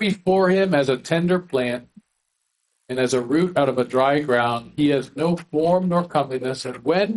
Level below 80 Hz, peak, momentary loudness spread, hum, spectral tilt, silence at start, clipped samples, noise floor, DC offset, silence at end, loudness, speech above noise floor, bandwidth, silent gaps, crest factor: -60 dBFS; -4 dBFS; 7 LU; none; -6 dB/octave; 0 s; under 0.1%; -74 dBFS; under 0.1%; 0 s; -21 LUFS; 53 dB; 11.5 kHz; none; 16 dB